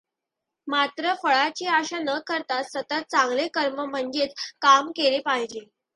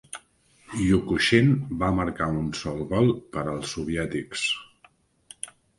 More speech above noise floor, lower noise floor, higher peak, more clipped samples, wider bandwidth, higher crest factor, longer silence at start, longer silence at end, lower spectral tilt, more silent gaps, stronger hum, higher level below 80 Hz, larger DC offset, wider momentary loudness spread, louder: first, 61 dB vs 36 dB; first, -85 dBFS vs -60 dBFS; about the same, -4 dBFS vs -6 dBFS; neither; about the same, 11 kHz vs 11.5 kHz; about the same, 20 dB vs 20 dB; first, 0.65 s vs 0.15 s; about the same, 0.3 s vs 0.3 s; second, -1.5 dB/octave vs -5.5 dB/octave; neither; neither; second, -76 dBFS vs -46 dBFS; neither; second, 10 LU vs 17 LU; about the same, -24 LUFS vs -25 LUFS